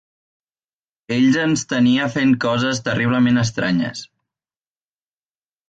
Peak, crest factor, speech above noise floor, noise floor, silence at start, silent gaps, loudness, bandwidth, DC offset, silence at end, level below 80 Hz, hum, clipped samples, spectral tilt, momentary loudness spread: -6 dBFS; 14 dB; over 73 dB; under -90 dBFS; 1.1 s; none; -18 LUFS; 8.8 kHz; under 0.1%; 1.65 s; -56 dBFS; none; under 0.1%; -5 dB/octave; 6 LU